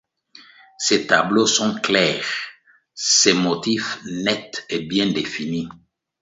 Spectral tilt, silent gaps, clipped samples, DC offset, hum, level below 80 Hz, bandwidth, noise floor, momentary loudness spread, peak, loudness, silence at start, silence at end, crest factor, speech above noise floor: -2.5 dB/octave; none; under 0.1%; under 0.1%; none; -60 dBFS; 8 kHz; -49 dBFS; 12 LU; 0 dBFS; -19 LUFS; 0.8 s; 0.45 s; 20 dB; 29 dB